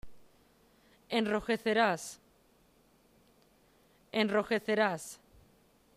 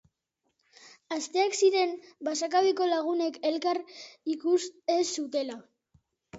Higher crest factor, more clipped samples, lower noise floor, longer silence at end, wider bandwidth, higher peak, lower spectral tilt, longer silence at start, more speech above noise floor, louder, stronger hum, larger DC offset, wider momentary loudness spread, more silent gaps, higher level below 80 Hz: about the same, 20 dB vs 18 dB; neither; second, -67 dBFS vs -80 dBFS; first, 0.8 s vs 0 s; first, 15.5 kHz vs 8 kHz; second, -16 dBFS vs -12 dBFS; first, -4 dB/octave vs -2 dB/octave; second, 0.05 s vs 0.85 s; second, 36 dB vs 52 dB; about the same, -31 LUFS vs -29 LUFS; neither; neither; first, 17 LU vs 12 LU; neither; first, -66 dBFS vs -78 dBFS